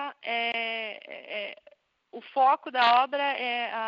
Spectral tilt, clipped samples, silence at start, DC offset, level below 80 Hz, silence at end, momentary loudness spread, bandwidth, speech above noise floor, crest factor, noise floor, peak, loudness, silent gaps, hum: 2.5 dB/octave; under 0.1%; 0 s; under 0.1%; -84 dBFS; 0 s; 17 LU; 7.2 kHz; 35 dB; 18 dB; -60 dBFS; -10 dBFS; -27 LUFS; none; none